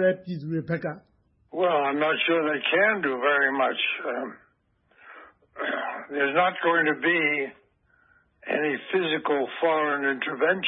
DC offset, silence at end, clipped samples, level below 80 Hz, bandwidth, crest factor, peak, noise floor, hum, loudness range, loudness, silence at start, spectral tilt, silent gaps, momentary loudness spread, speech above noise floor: under 0.1%; 0 s; under 0.1%; -72 dBFS; 5.6 kHz; 16 dB; -10 dBFS; -67 dBFS; none; 4 LU; -25 LUFS; 0 s; -9 dB/octave; none; 10 LU; 42 dB